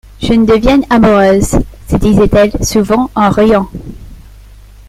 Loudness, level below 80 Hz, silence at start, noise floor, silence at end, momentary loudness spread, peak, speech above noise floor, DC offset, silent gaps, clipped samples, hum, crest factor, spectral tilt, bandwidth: -10 LUFS; -24 dBFS; 0.2 s; -35 dBFS; 0.7 s; 8 LU; 0 dBFS; 26 dB; under 0.1%; none; under 0.1%; none; 10 dB; -6 dB/octave; 15.5 kHz